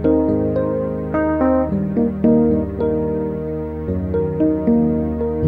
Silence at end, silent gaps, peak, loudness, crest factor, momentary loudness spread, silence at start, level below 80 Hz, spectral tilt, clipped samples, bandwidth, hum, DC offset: 0 s; none; -4 dBFS; -19 LUFS; 14 dB; 8 LU; 0 s; -34 dBFS; -12 dB/octave; under 0.1%; 4 kHz; none; under 0.1%